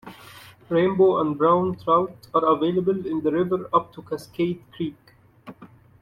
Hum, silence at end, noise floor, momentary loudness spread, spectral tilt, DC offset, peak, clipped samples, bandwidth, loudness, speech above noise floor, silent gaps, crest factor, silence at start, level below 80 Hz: none; 0.35 s; -49 dBFS; 13 LU; -8 dB/octave; under 0.1%; -6 dBFS; under 0.1%; 14 kHz; -23 LUFS; 27 dB; none; 18 dB; 0.05 s; -60 dBFS